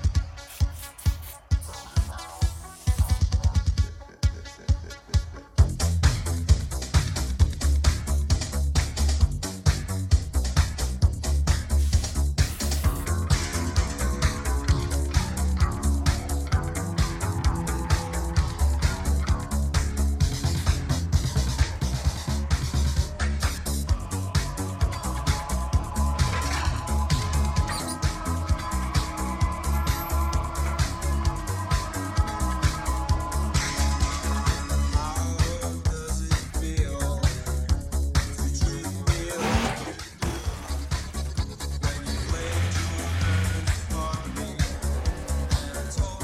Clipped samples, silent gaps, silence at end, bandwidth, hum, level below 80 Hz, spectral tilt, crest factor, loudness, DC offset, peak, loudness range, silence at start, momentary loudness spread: under 0.1%; none; 0 s; 15.5 kHz; none; -28 dBFS; -5 dB/octave; 18 dB; -27 LUFS; under 0.1%; -6 dBFS; 3 LU; 0 s; 5 LU